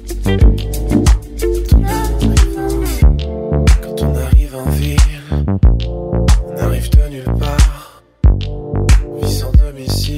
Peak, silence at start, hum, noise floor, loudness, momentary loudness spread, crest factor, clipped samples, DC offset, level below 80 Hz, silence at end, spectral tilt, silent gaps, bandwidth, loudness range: 0 dBFS; 0 s; none; -36 dBFS; -15 LUFS; 6 LU; 12 dB; under 0.1%; under 0.1%; -14 dBFS; 0 s; -6 dB/octave; none; 15.5 kHz; 1 LU